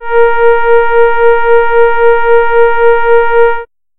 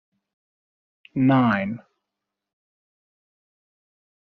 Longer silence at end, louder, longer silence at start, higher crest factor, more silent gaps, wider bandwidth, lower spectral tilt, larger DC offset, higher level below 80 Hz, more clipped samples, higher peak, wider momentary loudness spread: second, 0.35 s vs 2.55 s; first, -8 LUFS vs -21 LUFS; second, 0 s vs 1.15 s; second, 6 dB vs 20 dB; neither; second, 4 kHz vs 4.9 kHz; about the same, -7.5 dB/octave vs -6.5 dB/octave; neither; first, -34 dBFS vs -68 dBFS; neither; first, 0 dBFS vs -8 dBFS; second, 2 LU vs 15 LU